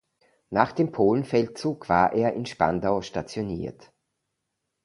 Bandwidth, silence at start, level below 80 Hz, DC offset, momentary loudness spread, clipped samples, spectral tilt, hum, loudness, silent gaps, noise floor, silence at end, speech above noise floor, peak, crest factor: 11.5 kHz; 0.5 s; -54 dBFS; under 0.1%; 10 LU; under 0.1%; -6.5 dB/octave; none; -25 LUFS; none; -80 dBFS; 1.15 s; 56 dB; -2 dBFS; 24 dB